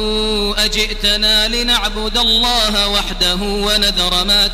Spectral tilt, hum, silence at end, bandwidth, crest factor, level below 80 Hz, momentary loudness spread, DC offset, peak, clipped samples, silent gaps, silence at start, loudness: -2 dB/octave; none; 0 s; 16 kHz; 14 dB; -24 dBFS; 5 LU; under 0.1%; -2 dBFS; under 0.1%; none; 0 s; -13 LUFS